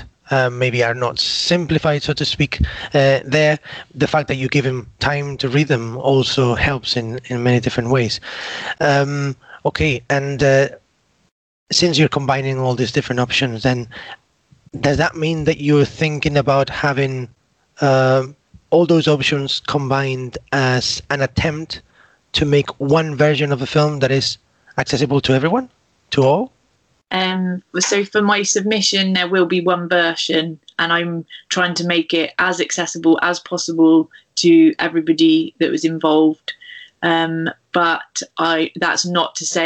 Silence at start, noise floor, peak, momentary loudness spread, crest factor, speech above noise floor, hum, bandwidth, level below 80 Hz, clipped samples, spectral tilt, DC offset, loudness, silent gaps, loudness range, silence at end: 0 s; -62 dBFS; -4 dBFS; 9 LU; 14 dB; 45 dB; none; 8.8 kHz; -42 dBFS; under 0.1%; -4.5 dB/octave; under 0.1%; -17 LUFS; 11.31-11.66 s; 3 LU; 0 s